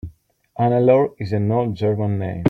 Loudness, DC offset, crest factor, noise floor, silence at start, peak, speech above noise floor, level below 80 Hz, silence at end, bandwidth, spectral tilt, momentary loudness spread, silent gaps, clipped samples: -19 LUFS; under 0.1%; 16 dB; -50 dBFS; 0.05 s; -2 dBFS; 32 dB; -50 dBFS; 0 s; 5.8 kHz; -10 dB/octave; 9 LU; none; under 0.1%